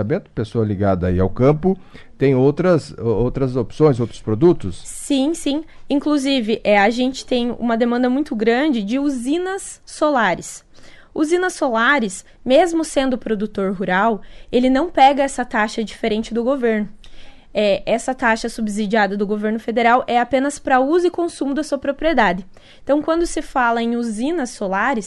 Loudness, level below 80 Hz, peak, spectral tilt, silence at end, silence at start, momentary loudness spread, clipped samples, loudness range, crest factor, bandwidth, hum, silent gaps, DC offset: -18 LUFS; -40 dBFS; -2 dBFS; -5.5 dB/octave; 0 s; 0 s; 8 LU; under 0.1%; 2 LU; 16 dB; 12 kHz; none; none; under 0.1%